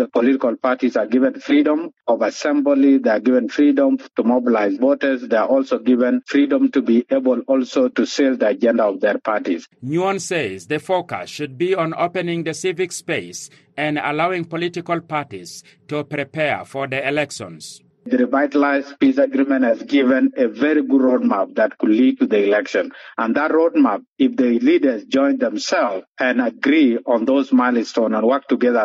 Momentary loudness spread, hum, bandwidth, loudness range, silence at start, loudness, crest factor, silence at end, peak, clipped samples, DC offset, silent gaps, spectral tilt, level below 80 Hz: 9 LU; none; 11.5 kHz; 6 LU; 0 s; -18 LUFS; 12 dB; 0 s; -6 dBFS; under 0.1%; under 0.1%; 24.08-24.16 s, 26.07-26.12 s; -5.5 dB/octave; -68 dBFS